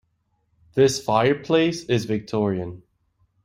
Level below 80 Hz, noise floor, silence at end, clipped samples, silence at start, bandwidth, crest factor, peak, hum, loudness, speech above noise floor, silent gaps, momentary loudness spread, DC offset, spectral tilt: -58 dBFS; -70 dBFS; 0.65 s; under 0.1%; 0.75 s; 16 kHz; 18 dB; -4 dBFS; none; -22 LUFS; 49 dB; none; 9 LU; under 0.1%; -5.5 dB/octave